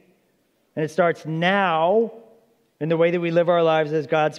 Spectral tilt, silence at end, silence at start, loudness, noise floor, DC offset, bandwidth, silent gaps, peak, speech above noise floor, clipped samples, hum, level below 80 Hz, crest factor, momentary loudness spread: -6.5 dB/octave; 0 s; 0.75 s; -21 LUFS; -66 dBFS; under 0.1%; 10.5 kHz; none; -6 dBFS; 46 dB; under 0.1%; none; -78 dBFS; 16 dB; 10 LU